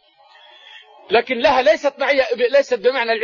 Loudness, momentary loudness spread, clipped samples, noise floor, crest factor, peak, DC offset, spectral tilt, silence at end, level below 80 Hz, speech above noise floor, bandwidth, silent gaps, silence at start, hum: -17 LUFS; 4 LU; under 0.1%; -49 dBFS; 14 dB; -4 dBFS; under 0.1%; -3 dB/octave; 0 s; -54 dBFS; 32 dB; 7.4 kHz; none; 0.75 s; none